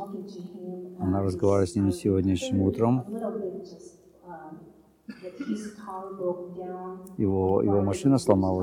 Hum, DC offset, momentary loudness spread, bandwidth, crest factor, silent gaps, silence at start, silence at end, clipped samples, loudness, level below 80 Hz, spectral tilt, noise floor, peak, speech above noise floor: none; under 0.1%; 19 LU; 15.5 kHz; 20 dB; none; 0 s; 0 s; under 0.1%; -27 LUFS; -58 dBFS; -7.5 dB/octave; -53 dBFS; -6 dBFS; 26 dB